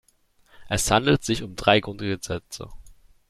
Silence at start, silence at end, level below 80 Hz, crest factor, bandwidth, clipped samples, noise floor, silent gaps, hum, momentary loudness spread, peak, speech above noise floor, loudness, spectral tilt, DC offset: 0.6 s; 0.4 s; -44 dBFS; 24 dB; 14.5 kHz; under 0.1%; -61 dBFS; none; none; 17 LU; -2 dBFS; 38 dB; -23 LUFS; -4 dB/octave; under 0.1%